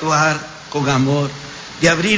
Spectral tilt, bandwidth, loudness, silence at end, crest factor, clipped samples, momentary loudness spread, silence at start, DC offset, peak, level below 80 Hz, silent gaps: -4.5 dB/octave; 8 kHz; -18 LUFS; 0 s; 16 dB; under 0.1%; 12 LU; 0 s; under 0.1%; -2 dBFS; -48 dBFS; none